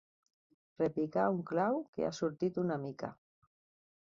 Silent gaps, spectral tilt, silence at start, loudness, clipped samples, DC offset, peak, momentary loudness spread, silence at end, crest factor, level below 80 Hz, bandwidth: 1.88-1.93 s; -6.5 dB/octave; 0.8 s; -35 LUFS; under 0.1%; under 0.1%; -18 dBFS; 8 LU; 0.9 s; 20 dB; -74 dBFS; 7.4 kHz